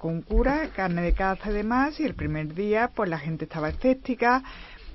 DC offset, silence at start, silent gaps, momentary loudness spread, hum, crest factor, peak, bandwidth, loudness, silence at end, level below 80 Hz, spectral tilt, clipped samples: under 0.1%; 0 s; none; 7 LU; none; 18 dB; -8 dBFS; 6 kHz; -26 LUFS; 0 s; -34 dBFS; -8.5 dB/octave; under 0.1%